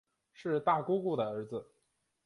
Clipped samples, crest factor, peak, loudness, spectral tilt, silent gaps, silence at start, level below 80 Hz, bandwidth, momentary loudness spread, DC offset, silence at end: under 0.1%; 20 dB; -16 dBFS; -34 LUFS; -8 dB/octave; none; 0.4 s; -78 dBFS; 11 kHz; 13 LU; under 0.1%; 0.65 s